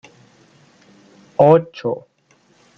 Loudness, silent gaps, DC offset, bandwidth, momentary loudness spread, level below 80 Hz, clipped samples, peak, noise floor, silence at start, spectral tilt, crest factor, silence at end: -17 LUFS; none; under 0.1%; 7 kHz; 15 LU; -64 dBFS; under 0.1%; -2 dBFS; -57 dBFS; 1.4 s; -8.5 dB/octave; 18 dB; 0.8 s